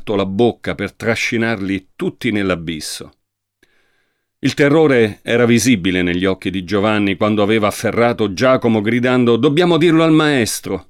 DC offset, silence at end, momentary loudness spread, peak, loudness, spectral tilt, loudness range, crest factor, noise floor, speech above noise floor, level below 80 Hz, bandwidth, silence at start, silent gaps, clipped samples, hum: under 0.1%; 0.1 s; 10 LU; -2 dBFS; -15 LUFS; -5.5 dB/octave; 7 LU; 14 dB; -65 dBFS; 50 dB; -50 dBFS; 16 kHz; 0 s; none; under 0.1%; none